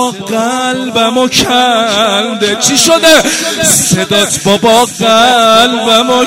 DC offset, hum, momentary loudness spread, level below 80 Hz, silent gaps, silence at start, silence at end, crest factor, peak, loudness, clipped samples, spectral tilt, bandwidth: under 0.1%; none; 7 LU; -44 dBFS; none; 0 s; 0 s; 8 dB; 0 dBFS; -8 LUFS; 0.2%; -2.5 dB/octave; 16.5 kHz